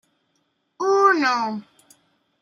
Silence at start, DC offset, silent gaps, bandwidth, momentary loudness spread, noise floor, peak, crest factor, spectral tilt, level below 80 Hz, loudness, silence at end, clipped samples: 0.8 s; under 0.1%; none; 11.5 kHz; 12 LU; -70 dBFS; -4 dBFS; 18 dB; -3.5 dB/octave; -82 dBFS; -19 LUFS; 0.8 s; under 0.1%